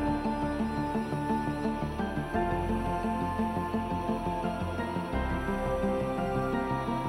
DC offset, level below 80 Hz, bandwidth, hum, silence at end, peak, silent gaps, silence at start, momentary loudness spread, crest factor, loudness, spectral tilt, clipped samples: under 0.1%; -42 dBFS; 16 kHz; none; 0 s; -18 dBFS; none; 0 s; 2 LU; 14 dB; -31 LUFS; -7.5 dB/octave; under 0.1%